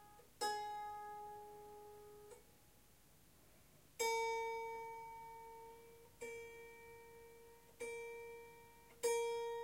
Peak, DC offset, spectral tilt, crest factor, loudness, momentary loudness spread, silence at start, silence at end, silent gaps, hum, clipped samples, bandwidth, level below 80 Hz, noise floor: -26 dBFS; under 0.1%; -1 dB/octave; 22 dB; -46 LUFS; 24 LU; 0 s; 0 s; none; none; under 0.1%; 16 kHz; -76 dBFS; -69 dBFS